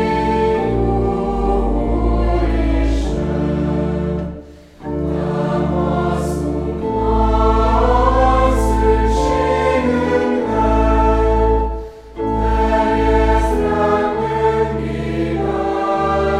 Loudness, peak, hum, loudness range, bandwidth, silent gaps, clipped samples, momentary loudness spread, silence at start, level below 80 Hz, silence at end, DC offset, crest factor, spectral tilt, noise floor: -17 LUFS; 0 dBFS; none; 5 LU; 11 kHz; none; under 0.1%; 7 LU; 0 s; -22 dBFS; 0 s; under 0.1%; 16 dB; -7.5 dB/octave; -36 dBFS